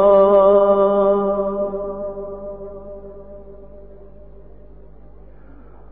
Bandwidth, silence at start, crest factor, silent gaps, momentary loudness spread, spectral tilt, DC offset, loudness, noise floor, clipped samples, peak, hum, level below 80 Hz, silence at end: 3.8 kHz; 0 s; 16 dB; none; 25 LU; -12 dB/octave; 0.8%; -16 LUFS; -43 dBFS; under 0.1%; -2 dBFS; none; -44 dBFS; 2.05 s